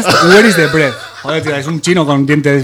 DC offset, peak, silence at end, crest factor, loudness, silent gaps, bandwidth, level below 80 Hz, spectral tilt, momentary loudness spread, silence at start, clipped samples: under 0.1%; 0 dBFS; 0 s; 10 dB; -10 LUFS; none; 19 kHz; -46 dBFS; -5 dB/octave; 11 LU; 0 s; 0.9%